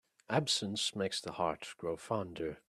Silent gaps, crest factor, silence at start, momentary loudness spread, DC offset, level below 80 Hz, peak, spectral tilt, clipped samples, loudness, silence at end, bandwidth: none; 20 dB; 0.3 s; 9 LU; under 0.1%; -70 dBFS; -18 dBFS; -3.5 dB/octave; under 0.1%; -36 LUFS; 0.1 s; 14 kHz